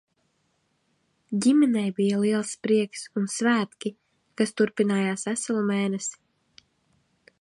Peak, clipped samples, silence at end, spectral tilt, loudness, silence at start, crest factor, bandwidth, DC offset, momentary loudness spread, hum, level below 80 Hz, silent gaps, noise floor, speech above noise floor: -10 dBFS; under 0.1%; 1.3 s; -5 dB/octave; -25 LUFS; 1.3 s; 18 dB; 11.5 kHz; under 0.1%; 10 LU; none; -74 dBFS; none; -71 dBFS; 47 dB